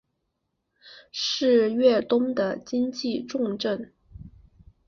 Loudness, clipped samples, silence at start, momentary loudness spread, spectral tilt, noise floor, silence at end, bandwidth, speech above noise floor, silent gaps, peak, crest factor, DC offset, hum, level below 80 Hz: -24 LUFS; under 0.1%; 0.85 s; 9 LU; -4.5 dB/octave; -78 dBFS; 0.6 s; 7.2 kHz; 54 dB; none; -8 dBFS; 18 dB; under 0.1%; none; -58 dBFS